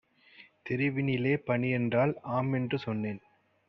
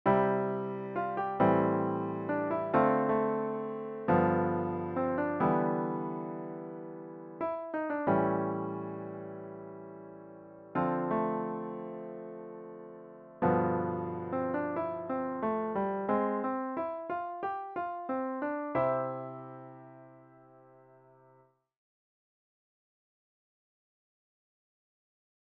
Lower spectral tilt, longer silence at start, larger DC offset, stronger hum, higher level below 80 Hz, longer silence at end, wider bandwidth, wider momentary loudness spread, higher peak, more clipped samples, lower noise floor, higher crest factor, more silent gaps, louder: about the same, -6.5 dB/octave vs -7.5 dB/octave; first, 0.4 s vs 0.05 s; neither; neither; about the same, -68 dBFS vs -70 dBFS; second, 0.5 s vs 5.25 s; first, 5.8 kHz vs 4.8 kHz; second, 8 LU vs 18 LU; about the same, -14 dBFS vs -12 dBFS; neither; second, -58 dBFS vs -65 dBFS; about the same, 18 dB vs 20 dB; neither; about the same, -30 LUFS vs -32 LUFS